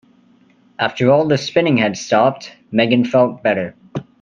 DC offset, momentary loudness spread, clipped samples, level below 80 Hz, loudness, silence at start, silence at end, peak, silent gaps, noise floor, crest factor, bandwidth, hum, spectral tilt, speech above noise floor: under 0.1%; 11 LU; under 0.1%; -60 dBFS; -16 LUFS; 0.8 s; 0.2 s; 0 dBFS; none; -52 dBFS; 16 dB; 7.6 kHz; none; -6 dB/octave; 37 dB